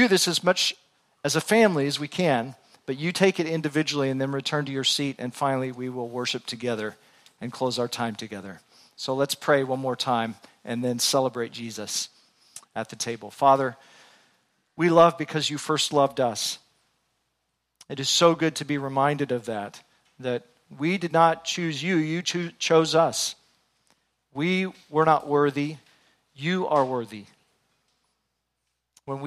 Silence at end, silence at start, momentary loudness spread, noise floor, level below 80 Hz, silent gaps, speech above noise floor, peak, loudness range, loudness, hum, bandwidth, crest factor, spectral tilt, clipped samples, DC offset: 0 s; 0 s; 15 LU; -79 dBFS; -72 dBFS; none; 54 dB; -4 dBFS; 5 LU; -25 LUFS; none; 15.5 kHz; 22 dB; -4 dB/octave; under 0.1%; under 0.1%